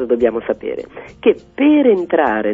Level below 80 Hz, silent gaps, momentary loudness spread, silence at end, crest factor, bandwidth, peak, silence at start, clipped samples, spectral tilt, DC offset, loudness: -50 dBFS; none; 13 LU; 0 s; 16 dB; 3.7 kHz; 0 dBFS; 0 s; under 0.1%; -7.5 dB/octave; under 0.1%; -16 LUFS